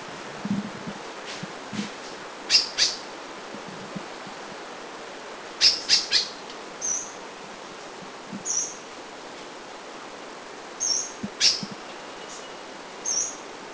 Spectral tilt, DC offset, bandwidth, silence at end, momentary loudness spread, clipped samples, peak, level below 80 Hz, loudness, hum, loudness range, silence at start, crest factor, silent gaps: -0.5 dB/octave; under 0.1%; 8 kHz; 0 s; 19 LU; under 0.1%; -4 dBFS; -66 dBFS; -25 LUFS; none; 7 LU; 0 s; 26 dB; none